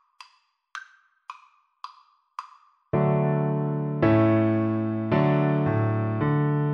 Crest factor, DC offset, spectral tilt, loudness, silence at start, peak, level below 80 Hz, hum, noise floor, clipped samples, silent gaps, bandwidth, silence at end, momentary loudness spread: 16 dB; under 0.1%; -10 dB/octave; -24 LUFS; 0.75 s; -8 dBFS; -56 dBFS; none; -63 dBFS; under 0.1%; none; 6.4 kHz; 0 s; 23 LU